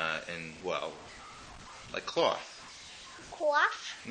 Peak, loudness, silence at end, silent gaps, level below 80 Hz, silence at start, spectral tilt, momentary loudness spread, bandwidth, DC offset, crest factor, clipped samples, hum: -14 dBFS; -33 LUFS; 0 s; none; -64 dBFS; 0 s; -2.5 dB/octave; 19 LU; 10 kHz; under 0.1%; 22 dB; under 0.1%; none